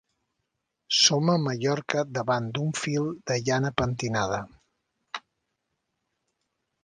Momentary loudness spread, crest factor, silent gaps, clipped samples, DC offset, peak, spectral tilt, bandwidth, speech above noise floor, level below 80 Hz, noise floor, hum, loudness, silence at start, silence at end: 19 LU; 24 dB; none; under 0.1%; under 0.1%; -6 dBFS; -4 dB/octave; 11 kHz; 55 dB; -56 dBFS; -80 dBFS; none; -26 LUFS; 0.9 s; 1.65 s